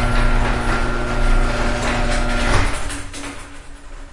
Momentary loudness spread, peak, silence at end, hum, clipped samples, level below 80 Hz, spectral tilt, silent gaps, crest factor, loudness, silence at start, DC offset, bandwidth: 17 LU; -2 dBFS; 0.05 s; none; under 0.1%; -20 dBFS; -4.5 dB/octave; none; 16 dB; -21 LUFS; 0 s; under 0.1%; 11.5 kHz